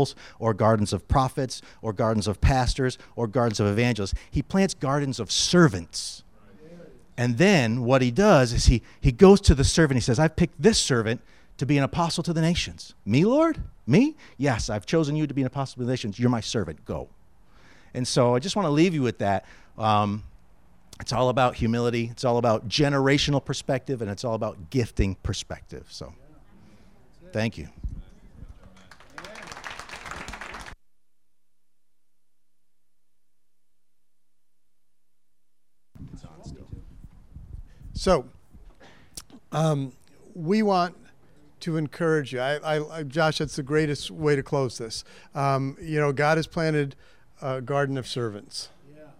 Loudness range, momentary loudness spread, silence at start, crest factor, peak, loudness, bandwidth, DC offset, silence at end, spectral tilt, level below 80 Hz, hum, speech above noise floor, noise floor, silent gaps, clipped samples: 16 LU; 18 LU; 0 s; 24 dB; -2 dBFS; -24 LUFS; 15 kHz; 0.2%; 0.15 s; -5.5 dB/octave; -38 dBFS; none; 58 dB; -82 dBFS; none; under 0.1%